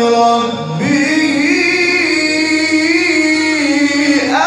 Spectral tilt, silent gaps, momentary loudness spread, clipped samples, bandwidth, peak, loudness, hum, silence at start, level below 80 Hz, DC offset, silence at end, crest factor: -3.5 dB/octave; none; 3 LU; under 0.1%; 11.5 kHz; 0 dBFS; -12 LUFS; none; 0 s; -62 dBFS; under 0.1%; 0 s; 12 dB